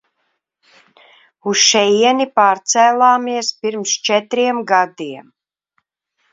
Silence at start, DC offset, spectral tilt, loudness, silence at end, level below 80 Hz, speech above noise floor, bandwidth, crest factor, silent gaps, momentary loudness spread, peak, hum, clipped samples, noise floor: 1.45 s; under 0.1%; -1.5 dB/octave; -14 LUFS; 1.1 s; -70 dBFS; 55 dB; 7.8 kHz; 16 dB; none; 11 LU; 0 dBFS; none; under 0.1%; -70 dBFS